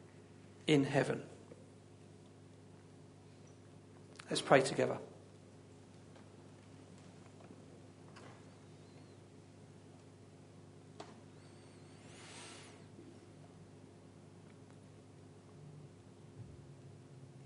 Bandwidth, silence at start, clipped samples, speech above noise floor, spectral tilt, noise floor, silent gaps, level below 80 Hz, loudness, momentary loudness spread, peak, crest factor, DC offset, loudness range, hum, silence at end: 10.5 kHz; 0.65 s; under 0.1%; 26 dB; -5 dB/octave; -59 dBFS; none; -78 dBFS; -35 LUFS; 24 LU; -12 dBFS; 30 dB; under 0.1%; 20 LU; none; 0 s